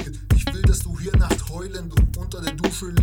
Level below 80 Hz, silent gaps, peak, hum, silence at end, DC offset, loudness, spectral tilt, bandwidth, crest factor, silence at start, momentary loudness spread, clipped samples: -24 dBFS; none; -6 dBFS; none; 0 s; 0.2%; -23 LUFS; -5.5 dB/octave; 17.5 kHz; 14 dB; 0 s; 8 LU; under 0.1%